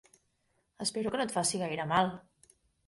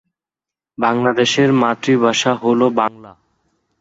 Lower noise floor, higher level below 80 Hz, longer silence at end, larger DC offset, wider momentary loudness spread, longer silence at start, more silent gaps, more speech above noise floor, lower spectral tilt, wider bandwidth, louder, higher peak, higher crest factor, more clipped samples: second, -76 dBFS vs -88 dBFS; second, -68 dBFS vs -60 dBFS; about the same, 0.7 s vs 0.7 s; neither; about the same, 6 LU vs 6 LU; about the same, 0.8 s vs 0.8 s; neither; second, 44 dB vs 73 dB; about the same, -3.5 dB/octave vs -4.5 dB/octave; first, 12 kHz vs 8 kHz; second, -32 LUFS vs -15 LUFS; second, -14 dBFS vs -2 dBFS; about the same, 20 dB vs 16 dB; neither